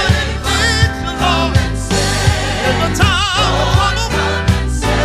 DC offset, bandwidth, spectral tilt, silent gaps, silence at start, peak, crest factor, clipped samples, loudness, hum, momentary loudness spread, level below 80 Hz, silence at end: under 0.1%; 14.5 kHz; -4 dB/octave; none; 0 s; 0 dBFS; 12 dB; under 0.1%; -14 LUFS; none; 3 LU; -20 dBFS; 0 s